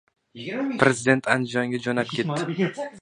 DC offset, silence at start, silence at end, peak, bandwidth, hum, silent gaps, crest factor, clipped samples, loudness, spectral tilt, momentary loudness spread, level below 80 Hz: under 0.1%; 0.35 s; 0 s; 0 dBFS; 11 kHz; none; none; 24 dB; under 0.1%; -24 LUFS; -5 dB/octave; 8 LU; -64 dBFS